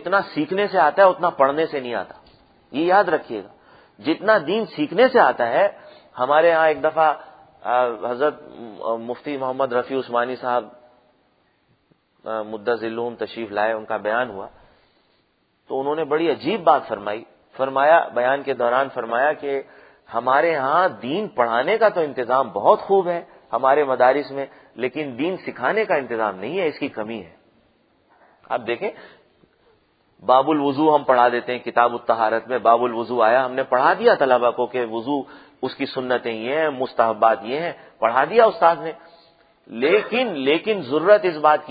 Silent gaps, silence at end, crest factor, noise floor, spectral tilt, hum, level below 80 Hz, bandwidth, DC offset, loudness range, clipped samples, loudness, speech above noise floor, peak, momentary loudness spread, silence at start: none; 0 s; 20 dB; -65 dBFS; -9 dB/octave; none; -68 dBFS; 5 kHz; under 0.1%; 8 LU; under 0.1%; -20 LUFS; 45 dB; 0 dBFS; 13 LU; 0 s